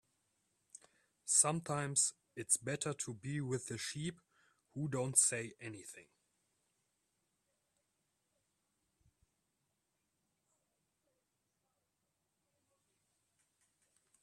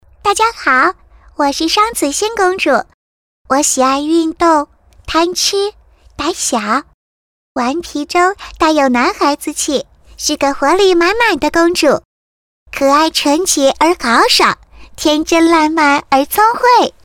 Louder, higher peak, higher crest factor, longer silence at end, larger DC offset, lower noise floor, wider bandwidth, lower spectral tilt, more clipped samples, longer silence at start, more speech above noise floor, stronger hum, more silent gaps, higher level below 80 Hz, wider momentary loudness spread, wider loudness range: second, -35 LUFS vs -12 LUFS; second, -14 dBFS vs 0 dBFS; first, 28 dB vs 12 dB; first, 8.2 s vs 0.15 s; neither; second, -85 dBFS vs under -90 dBFS; second, 14.5 kHz vs 18 kHz; about the same, -3 dB/octave vs -2 dB/octave; neither; first, 1.25 s vs 0.25 s; second, 48 dB vs over 78 dB; neither; second, none vs 2.94-3.45 s, 6.94-7.55 s, 12.05-12.66 s; second, -80 dBFS vs -42 dBFS; first, 19 LU vs 8 LU; about the same, 4 LU vs 5 LU